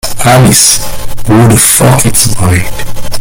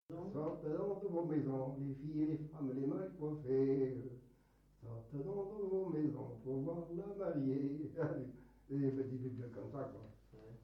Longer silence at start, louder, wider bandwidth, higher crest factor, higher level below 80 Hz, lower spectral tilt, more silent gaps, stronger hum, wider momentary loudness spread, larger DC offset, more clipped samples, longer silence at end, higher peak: about the same, 0.05 s vs 0.1 s; first, -5 LUFS vs -41 LUFS; first, over 20 kHz vs 6 kHz; second, 6 dB vs 16 dB; first, -22 dBFS vs -70 dBFS; second, -4 dB/octave vs -11 dB/octave; neither; neither; about the same, 15 LU vs 14 LU; neither; first, 3% vs under 0.1%; about the same, 0 s vs 0 s; first, 0 dBFS vs -26 dBFS